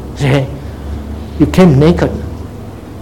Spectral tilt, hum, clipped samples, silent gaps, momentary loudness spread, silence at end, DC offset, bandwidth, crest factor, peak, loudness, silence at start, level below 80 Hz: -7.5 dB/octave; none; 0.5%; none; 20 LU; 0 s; 0.8%; 16.5 kHz; 12 dB; 0 dBFS; -11 LUFS; 0 s; -26 dBFS